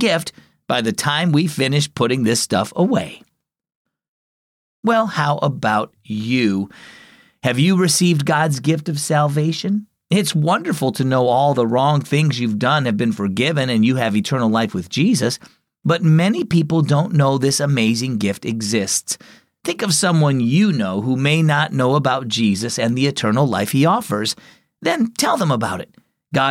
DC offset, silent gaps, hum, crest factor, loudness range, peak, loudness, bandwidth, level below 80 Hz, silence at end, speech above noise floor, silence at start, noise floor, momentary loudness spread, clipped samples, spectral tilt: under 0.1%; 3.75-3.85 s, 4.08-4.83 s; none; 12 dB; 4 LU; -4 dBFS; -18 LUFS; 16 kHz; -60 dBFS; 0 s; over 73 dB; 0 s; under -90 dBFS; 7 LU; under 0.1%; -5 dB/octave